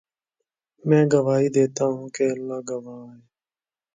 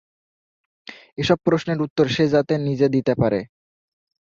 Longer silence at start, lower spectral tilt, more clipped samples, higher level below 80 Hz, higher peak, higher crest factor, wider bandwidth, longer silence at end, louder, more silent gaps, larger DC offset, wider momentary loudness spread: about the same, 0.85 s vs 0.9 s; about the same, -7 dB/octave vs -7 dB/octave; neither; second, -70 dBFS vs -54 dBFS; about the same, -4 dBFS vs -2 dBFS; about the same, 20 dB vs 20 dB; first, 9.4 kHz vs 7.6 kHz; about the same, 0.8 s vs 0.85 s; about the same, -22 LUFS vs -20 LUFS; second, none vs 1.90-1.96 s; neither; second, 15 LU vs 19 LU